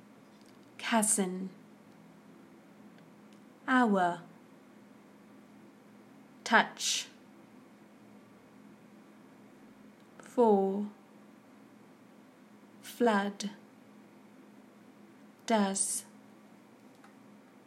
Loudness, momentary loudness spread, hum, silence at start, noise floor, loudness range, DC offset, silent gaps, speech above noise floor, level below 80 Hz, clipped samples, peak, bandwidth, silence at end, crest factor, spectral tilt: -30 LUFS; 22 LU; none; 0.8 s; -57 dBFS; 4 LU; under 0.1%; none; 28 dB; -90 dBFS; under 0.1%; -8 dBFS; 15.5 kHz; 1.65 s; 28 dB; -3 dB/octave